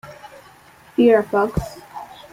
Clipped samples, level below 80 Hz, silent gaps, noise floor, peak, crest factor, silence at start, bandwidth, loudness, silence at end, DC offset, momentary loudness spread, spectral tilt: under 0.1%; -42 dBFS; none; -48 dBFS; -2 dBFS; 18 dB; 0.05 s; 16 kHz; -18 LUFS; 0.25 s; under 0.1%; 22 LU; -7 dB/octave